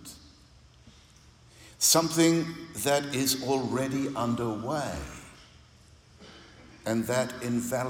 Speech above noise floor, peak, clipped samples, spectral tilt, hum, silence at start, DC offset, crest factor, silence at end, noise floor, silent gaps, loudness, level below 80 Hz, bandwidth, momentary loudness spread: 28 dB; -10 dBFS; under 0.1%; -3.5 dB/octave; none; 0 s; under 0.1%; 20 dB; 0 s; -56 dBFS; none; -27 LUFS; -56 dBFS; 17.5 kHz; 17 LU